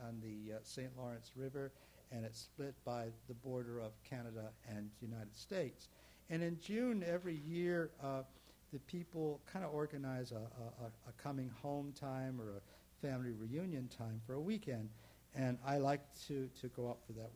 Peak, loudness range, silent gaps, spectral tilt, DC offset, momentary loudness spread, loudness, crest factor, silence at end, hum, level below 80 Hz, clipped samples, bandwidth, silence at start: -24 dBFS; 6 LU; none; -6.5 dB/octave; under 0.1%; 12 LU; -46 LUFS; 22 dB; 0 s; none; -72 dBFS; under 0.1%; over 20 kHz; 0 s